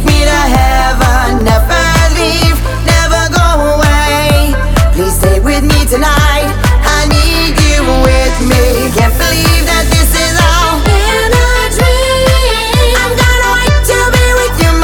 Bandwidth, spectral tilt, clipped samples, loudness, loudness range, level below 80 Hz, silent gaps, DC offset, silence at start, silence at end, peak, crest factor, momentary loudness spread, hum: 19 kHz; -4.5 dB/octave; under 0.1%; -9 LUFS; 1 LU; -12 dBFS; none; under 0.1%; 0 s; 0 s; 0 dBFS; 8 dB; 2 LU; none